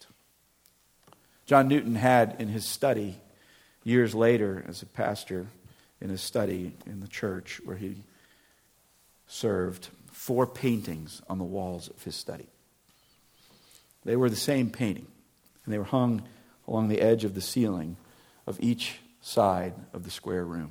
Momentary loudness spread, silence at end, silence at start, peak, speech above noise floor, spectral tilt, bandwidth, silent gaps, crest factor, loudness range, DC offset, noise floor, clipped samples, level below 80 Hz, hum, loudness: 18 LU; 0 s; 1.5 s; -6 dBFS; 38 dB; -5.5 dB/octave; 19 kHz; none; 24 dB; 9 LU; under 0.1%; -66 dBFS; under 0.1%; -64 dBFS; none; -29 LUFS